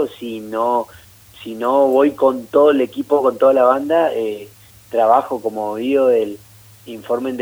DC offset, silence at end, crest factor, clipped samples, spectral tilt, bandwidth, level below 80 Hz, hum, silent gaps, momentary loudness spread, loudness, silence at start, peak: under 0.1%; 0 s; 16 dB; under 0.1%; -6 dB/octave; over 20 kHz; -60 dBFS; none; none; 17 LU; -17 LUFS; 0 s; -2 dBFS